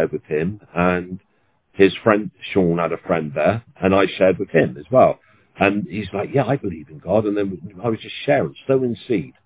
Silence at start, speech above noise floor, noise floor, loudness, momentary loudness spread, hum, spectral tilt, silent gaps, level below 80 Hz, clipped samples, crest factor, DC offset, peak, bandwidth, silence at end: 0 s; 38 dB; -57 dBFS; -20 LUFS; 10 LU; none; -11 dB/octave; none; -48 dBFS; under 0.1%; 20 dB; under 0.1%; 0 dBFS; 4 kHz; 0.15 s